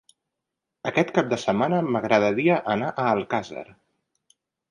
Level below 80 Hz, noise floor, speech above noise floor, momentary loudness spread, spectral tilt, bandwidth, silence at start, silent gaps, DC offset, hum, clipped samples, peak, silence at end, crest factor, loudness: -64 dBFS; -84 dBFS; 61 dB; 8 LU; -6.5 dB/octave; 11 kHz; 0.85 s; none; under 0.1%; none; under 0.1%; -6 dBFS; 1.1 s; 20 dB; -23 LUFS